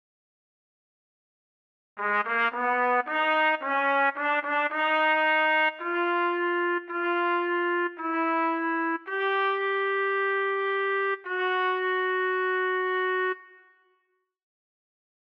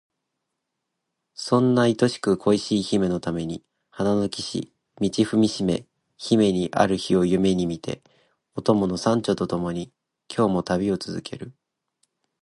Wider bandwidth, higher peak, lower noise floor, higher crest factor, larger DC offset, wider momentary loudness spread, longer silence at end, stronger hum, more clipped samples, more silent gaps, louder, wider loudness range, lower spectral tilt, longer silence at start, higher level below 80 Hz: second, 6 kHz vs 11.5 kHz; second, -14 dBFS vs -2 dBFS; second, -74 dBFS vs -81 dBFS; second, 14 dB vs 22 dB; neither; second, 5 LU vs 15 LU; first, 1.9 s vs 0.9 s; neither; neither; neither; about the same, -25 LUFS vs -23 LUFS; about the same, 4 LU vs 3 LU; second, -4.5 dB/octave vs -6 dB/octave; first, 1.95 s vs 1.4 s; second, -80 dBFS vs -54 dBFS